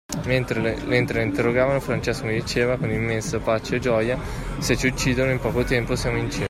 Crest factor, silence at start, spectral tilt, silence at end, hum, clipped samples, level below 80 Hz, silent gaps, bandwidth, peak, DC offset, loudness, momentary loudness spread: 18 dB; 0.1 s; -5.5 dB/octave; 0 s; none; under 0.1%; -36 dBFS; none; 16 kHz; -4 dBFS; under 0.1%; -23 LUFS; 4 LU